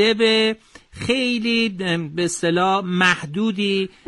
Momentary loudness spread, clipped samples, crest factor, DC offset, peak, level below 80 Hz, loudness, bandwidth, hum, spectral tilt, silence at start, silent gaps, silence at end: 7 LU; under 0.1%; 16 dB; under 0.1%; -4 dBFS; -56 dBFS; -19 LUFS; 11.5 kHz; none; -4 dB/octave; 0 s; none; 0.2 s